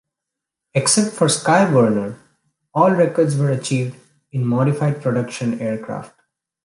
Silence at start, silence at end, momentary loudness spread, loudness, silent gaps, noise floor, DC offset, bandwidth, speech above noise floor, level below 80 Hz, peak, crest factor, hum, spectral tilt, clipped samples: 0.75 s; 0.6 s; 12 LU; -18 LUFS; none; -83 dBFS; under 0.1%; 11.5 kHz; 66 dB; -62 dBFS; -2 dBFS; 16 dB; none; -5 dB/octave; under 0.1%